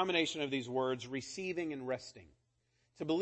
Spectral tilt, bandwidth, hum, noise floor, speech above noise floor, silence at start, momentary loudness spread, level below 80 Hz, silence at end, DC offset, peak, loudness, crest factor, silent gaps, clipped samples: -4 dB/octave; 8.4 kHz; none; -78 dBFS; 40 dB; 0 s; 9 LU; -74 dBFS; 0 s; under 0.1%; -18 dBFS; -38 LUFS; 20 dB; none; under 0.1%